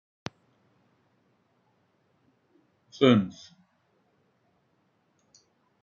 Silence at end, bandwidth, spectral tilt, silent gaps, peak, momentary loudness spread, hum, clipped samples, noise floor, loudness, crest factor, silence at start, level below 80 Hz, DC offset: 2.5 s; 7.2 kHz; -5.5 dB/octave; none; -6 dBFS; 28 LU; none; under 0.1%; -71 dBFS; -24 LUFS; 26 dB; 3 s; -76 dBFS; under 0.1%